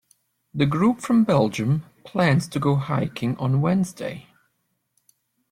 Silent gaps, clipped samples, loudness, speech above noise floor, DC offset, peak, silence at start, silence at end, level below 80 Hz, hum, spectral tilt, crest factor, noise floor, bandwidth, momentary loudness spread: none; under 0.1%; -22 LUFS; 52 dB; under 0.1%; -6 dBFS; 0.55 s; 1.3 s; -58 dBFS; none; -7 dB/octave; 18 dB; -73 dBFS; 14.5 kHz; 12 LU